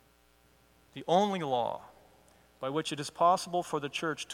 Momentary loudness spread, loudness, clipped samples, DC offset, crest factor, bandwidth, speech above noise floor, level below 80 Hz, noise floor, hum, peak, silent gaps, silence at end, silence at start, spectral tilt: 14 LU; -31 LUFS; under 0.1%; under 0.1%; 20 dB; 16.5 kHz; 34 dB; -72 dBFS; -65 dBFS; none; -14 dBFS; none; 0 s; 0.95 s; -4.5 dB/octave